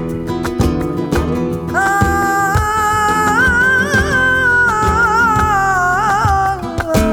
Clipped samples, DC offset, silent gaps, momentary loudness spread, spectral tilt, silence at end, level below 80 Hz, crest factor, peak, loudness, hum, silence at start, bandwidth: under 0.1%; under 0.1%; none; 7 LU; -5 dB/octave; 0 s; -26 dBFS; 12 dB; -2 dBFS; -13 LUFS; none; 0 s; over 20 kHz